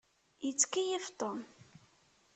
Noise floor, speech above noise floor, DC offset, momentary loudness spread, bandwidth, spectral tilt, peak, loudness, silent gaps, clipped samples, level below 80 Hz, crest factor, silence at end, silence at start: -69 dBFS; 33 dB; under 0.1%; 14 LU; 9 kHz; -1.5 dB/octave; -14 dBFS; -35 LUFS; none; under 0.1%; -82 dBFS; 24 dB; 0.75 s; 0.4 s